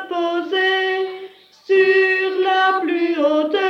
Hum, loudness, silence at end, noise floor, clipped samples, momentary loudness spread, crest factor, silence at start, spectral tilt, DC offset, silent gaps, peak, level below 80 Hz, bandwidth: 50 Hz at -70 dBFS; -17 LUFS; 0 s; -39 dBFS; under 0.1%; 7 LU; 14 dB; 0 s; -3.5 dB/octave; under 0.1%; none; -4 dBFS; -80 dBFS; 6.4 kHz